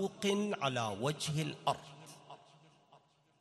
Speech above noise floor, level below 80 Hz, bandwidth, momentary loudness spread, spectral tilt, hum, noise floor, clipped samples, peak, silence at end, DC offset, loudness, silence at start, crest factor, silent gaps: 31 dB; -74 dBFS; 13 kHz; 20 LU; -4.5 dB/octave; none; -67 dBFS; under 0.1%; -16 dBFS; 0.45 s; under 0.1%; -36 LUFS; 0 s; 22 dB; none